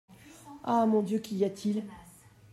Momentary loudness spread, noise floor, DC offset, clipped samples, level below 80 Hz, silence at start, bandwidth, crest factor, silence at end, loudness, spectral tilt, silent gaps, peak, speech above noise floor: 21 LU; -55 dBFS; under 0.1%; under 0.1%; -68 dBFS; 0.1 s; 14 kHz; 16 dB; 0.5 s; -30 LUFS; -7 dB/octave; none; -16 dBFS; 27 dB